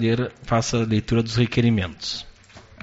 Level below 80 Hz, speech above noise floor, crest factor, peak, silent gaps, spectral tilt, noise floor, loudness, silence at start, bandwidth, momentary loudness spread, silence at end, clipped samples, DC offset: -44 dBFS; 26 dB; 16 dB; -6 dBFS; none; -5.5 dB/octave; -47 dBFS; -23 LUFS; 0 s; 8 kHz; 9 LU; 0.2 s; under 0.1%; under 0.1%